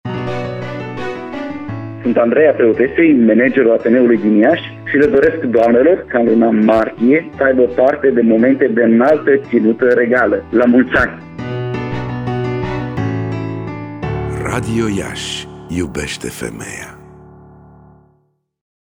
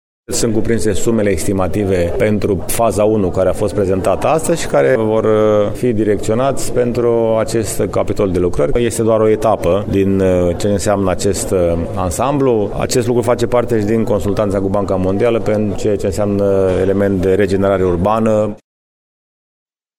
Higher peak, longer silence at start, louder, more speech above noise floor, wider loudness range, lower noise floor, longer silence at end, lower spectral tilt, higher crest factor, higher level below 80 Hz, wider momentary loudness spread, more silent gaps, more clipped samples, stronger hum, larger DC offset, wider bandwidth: about the same, -2 dBFS vs 0 dBFS; second, 0.05 s vs 0.3 s; about the same, -14 LUFS vs -15 LUFS; second, 48 dB vs over 76 dB; first, 10 LU vs 1 LU; second, -60 dBFS vs under -90 dBFS; first, 2 s vs 1.4 s; about the same, -6.5 dB/octave vs -6 dB/octave; about the same, 12 dB vs 14 dB; second, -40 dBFS vs -32 dBFS; first, 14 LU vs 4 LU; neither; neither; neither; neither; second, 14.5 kHz vs 16.5 kHz